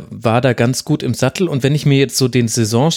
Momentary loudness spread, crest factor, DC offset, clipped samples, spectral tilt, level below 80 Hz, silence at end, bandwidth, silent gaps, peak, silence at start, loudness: 4 LU; 14 dB; under 0.1%; under 0.1%; -5.5 dB/octave; -50 dBFS; 0 s; 16.5 kHz; none; -2 dBFS; 0 s; -15 LUFS